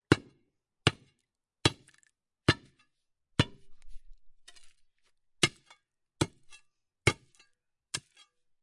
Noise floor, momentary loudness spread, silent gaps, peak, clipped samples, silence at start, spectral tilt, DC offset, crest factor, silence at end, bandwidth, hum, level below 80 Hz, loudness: -83 dBFS; 10 LU; none; -4 dBFS; under 0.1%; 0.1 s; -4 dB/octave; under 0.1%; 30 dB; 0.65 s; 11.5 kHz; none; -56 dBFS; -32 LUFS